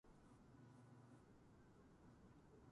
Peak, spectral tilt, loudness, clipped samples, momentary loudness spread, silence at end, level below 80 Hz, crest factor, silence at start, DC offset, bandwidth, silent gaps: -54 dBFS; -7 dB/octave; -68 LUFS; under 0.1%; 3 LU; 0 s; -78 dBFS; 14 dB; 0.05 s; under 0.1%; 11 kHz; none